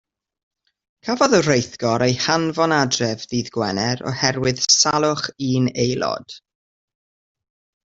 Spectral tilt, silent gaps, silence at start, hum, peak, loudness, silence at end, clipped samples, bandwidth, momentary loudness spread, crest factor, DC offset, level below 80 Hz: -3.5 dB/octave; none; 1.05 s; none; -2 dBFS; -19 LUFS; 1.55 s; under 0.1%; 8 kHz; 10 LU; 20 dB; under 0.1%; -54 dBFS